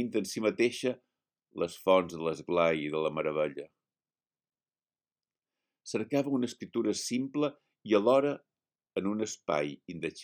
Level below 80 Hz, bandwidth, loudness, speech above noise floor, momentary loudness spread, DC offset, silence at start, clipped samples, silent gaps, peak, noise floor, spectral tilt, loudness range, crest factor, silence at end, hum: -74 dBFS; 18 kHz; -31 LUFS; over 60 dB; 12 LU; under 0.1%; 0 s; under 0.1%; none; -12 dBFS; under -90 dBFS; -5 dB/octave; 7 LU; 20 dB; 0 s; none